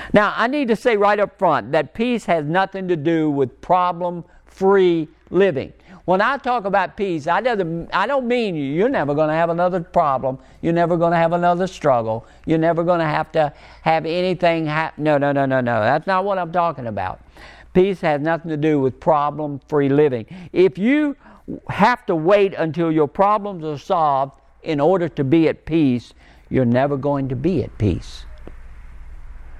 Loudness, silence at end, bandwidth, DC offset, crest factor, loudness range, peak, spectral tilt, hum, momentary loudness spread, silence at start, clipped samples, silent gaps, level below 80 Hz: -19 LUFS; 0 s; 10.5 kHz; under 0.1%; 18 dB; 2 LU; 0 dBFS; -7.5 dB/octave; none; 9 LU; 0 s; under 0.1%; none; -44 dBFS